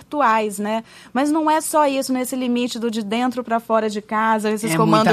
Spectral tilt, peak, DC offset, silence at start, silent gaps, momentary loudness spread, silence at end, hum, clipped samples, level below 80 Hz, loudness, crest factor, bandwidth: -4.5 dB/octave; 0 dBFS; under 0.1%; 0 s; none; 7 LU; 0 s; 60 Hz at -60 dBFS; under 0.1%; -62 dBFS; -20 LUFS; 18 dB; 14 kHz